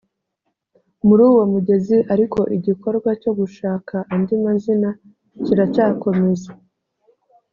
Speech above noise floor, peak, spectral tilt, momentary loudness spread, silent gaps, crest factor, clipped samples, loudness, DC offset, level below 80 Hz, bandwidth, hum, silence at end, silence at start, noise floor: 58 dB; -2 dBFS; -9 dB/octave; 11 LU; none; 16 dB; under 0.1%; -18 LUFS; under 0.1%; -56 dBFS; 7.2 kHz; none; 1 s; 1.05 s; -74 dBFS